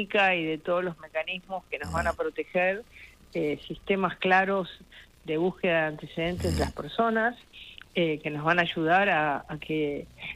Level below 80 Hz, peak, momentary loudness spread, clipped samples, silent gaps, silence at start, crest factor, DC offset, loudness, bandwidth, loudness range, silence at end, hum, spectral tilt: -50 dBFS; -8 dBFS; 12 LU; under 0.1%; none; 0 s; 20 dB; under 0.1%; -28 LUFS; 15.5 kHz; 4 LU; 0 s; none; -5.5 dB/octave